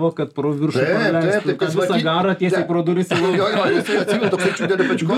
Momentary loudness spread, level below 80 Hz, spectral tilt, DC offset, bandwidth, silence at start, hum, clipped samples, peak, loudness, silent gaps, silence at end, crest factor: 3 LU; -64 dBFS; -6 dB/octave; under 0.1%; 13.5 kHz; 0 s; none; under 0.1%; -4 dBFS; -18 LUFS; none; 0 s; 14 dB